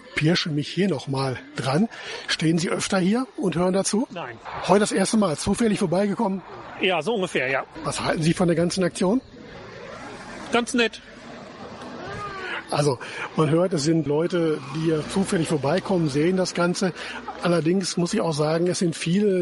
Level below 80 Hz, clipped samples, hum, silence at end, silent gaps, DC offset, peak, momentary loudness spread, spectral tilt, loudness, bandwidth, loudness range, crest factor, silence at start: -54 dBFS; under 0.1%; none; 0 s; none; under 0.1%; -4 dBFS; 15 LU; -5 dB/octave; -23 LUFS; 11.5 kHz; 4 LU; 18 dB; 0 s